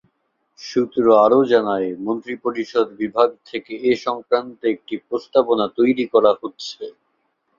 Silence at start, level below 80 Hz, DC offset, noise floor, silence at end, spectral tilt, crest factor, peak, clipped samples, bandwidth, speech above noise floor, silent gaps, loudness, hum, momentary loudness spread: 0.6 s; -64 dBFS; under 0.1%; -70 dBFS; 0.7 s; -5.5 dB/octave; 18 dB; -2 dBFS; under 0.1%; 7.4 kHz; 51 dB; none; -19 LUFS; none; 16 LU